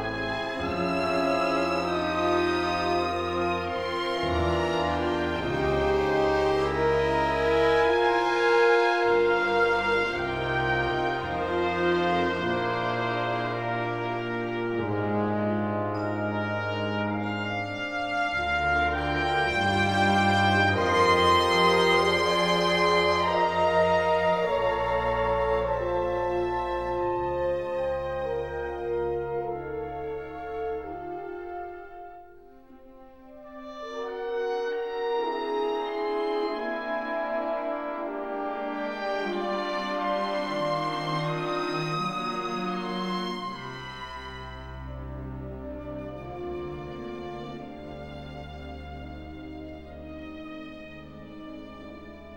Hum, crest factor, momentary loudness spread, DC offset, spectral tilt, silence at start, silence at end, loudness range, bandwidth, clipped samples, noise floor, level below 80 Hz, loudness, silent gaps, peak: none; 18 dB; 18 LU; 0.2%; -5.5 dB/octave; 0 s; 0 s; 16 LU; 16 kHz; under 0.1%; -51 dBFS; -46 dBFS; -26 LUFS; none; -10 dBFS